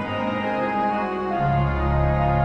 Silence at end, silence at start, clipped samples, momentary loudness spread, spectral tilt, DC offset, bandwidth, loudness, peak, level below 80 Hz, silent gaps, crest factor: 0 s; 0 s; under 0.1%; 4 LU; -9 dB/octave; under 0.1%; 6 kHz; -23 LUFS; -10 dBFS; -30 dBFS; none; 12 dB